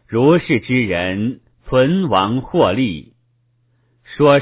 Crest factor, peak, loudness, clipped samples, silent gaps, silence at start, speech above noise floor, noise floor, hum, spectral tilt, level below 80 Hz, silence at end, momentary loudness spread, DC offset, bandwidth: 16 dB; 0 dBFS; -16 LUFS; under 0.1%; none; 0.1 s; 46 dB; -61 dBFS; none; -10.5 dB/octave; -44 dBFS; 0 s; 10 LU; under 0.1%; 4 kHz